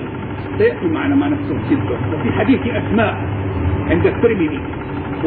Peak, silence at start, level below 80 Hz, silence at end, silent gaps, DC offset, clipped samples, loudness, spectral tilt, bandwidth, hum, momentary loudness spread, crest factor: -2 dBFS; 0 s; -34 dBFS; 0 s; none; under 0.1%; under 0.1%; -18 LUFS; -12.5 dB/octave; 4.5 kHz; none; 9 LU; 14 dB